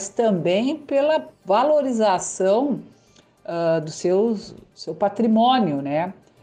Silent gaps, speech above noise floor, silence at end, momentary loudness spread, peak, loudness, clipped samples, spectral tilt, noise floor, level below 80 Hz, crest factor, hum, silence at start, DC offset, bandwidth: none; 35 dB; 0.3 s; 13 LU; -8 dBFS; -21 LUFS; under 0.1%; -5 dB/octave; -55 dBFS; -64 dBFS; 14 dB; none; 0 s; under 0.1%; 9.8 kHz